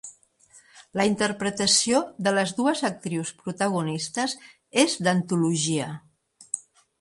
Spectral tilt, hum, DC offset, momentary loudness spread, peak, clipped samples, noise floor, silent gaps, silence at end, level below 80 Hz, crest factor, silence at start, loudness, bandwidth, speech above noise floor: -3.5 dB/octave; none; under 0.1%; 14 LU; -4 dBFS; under 0.1%; -57 dBFS; none; 0.4 s; -64 dBFS; 22 dB; 0.05 s; -25 LUFS; 11.5 kHz; 32 dB